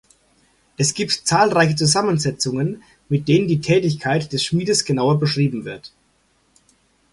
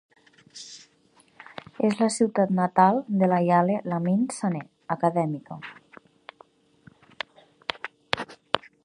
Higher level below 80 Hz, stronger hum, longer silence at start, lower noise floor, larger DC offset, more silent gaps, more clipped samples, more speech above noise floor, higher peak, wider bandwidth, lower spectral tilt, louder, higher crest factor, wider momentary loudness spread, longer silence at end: first, -54 dBFS vs -68 dBFS; neither; first, 0.8 s vs 0.55 s; about the same, -62 dBFS vs -61 dBFS; neither; neither; neither; first, 43 dB vs 38 dB; about the same, -2 dBFS vs 0 dBFS; about the same, 11.5 kHz vs 11 kHz; second, -4.5 dB/octave vs -6 dB/octave; first, -19 LUFS vs -25 LUFS; second, 18 dB vs 26 dB; second, 8 LU vs 22 LU; first, 1.25 s vs 0.25 s